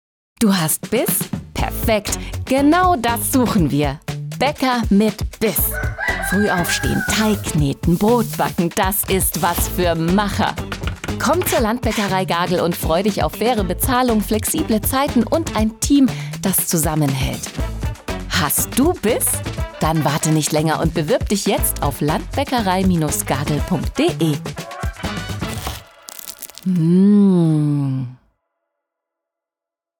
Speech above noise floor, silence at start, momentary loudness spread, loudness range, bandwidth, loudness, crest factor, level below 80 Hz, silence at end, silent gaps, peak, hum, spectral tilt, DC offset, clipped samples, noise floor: 70 dB; 0.4 s; 10 LU; 2 LU; over 20 kHz; -18 LUFS; 14 dB; -32 dBFS; 1.85 s; none; -6 dBFS; none; -5 dB/octave; under 0.1%; under 0.1%; -87 dBFS